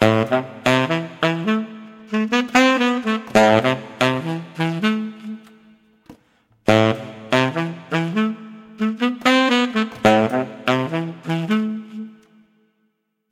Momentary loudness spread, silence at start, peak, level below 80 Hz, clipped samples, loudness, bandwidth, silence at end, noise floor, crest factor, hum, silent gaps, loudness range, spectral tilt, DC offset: 15 LU; 0 s; -2 dBFS; -58 dBFS; under 0.1%; -19 LUFS; 15.5 kHz; 1.2 s; -69 dBFS; 18 dB; none; none; 4 LU; -5.5 dB/octave; under 0.1%